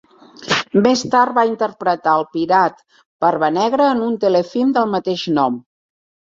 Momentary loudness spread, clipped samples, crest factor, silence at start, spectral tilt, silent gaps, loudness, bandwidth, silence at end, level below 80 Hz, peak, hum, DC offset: 5 LU; under 0.1%; 16 dB; 0.4 s; -5 dB/octave; 3.06-3.20 s; -17 LUFS; 7.8 kHz; 0.7 s; -62 dBFS; -2 dBFS; none; under 0.1%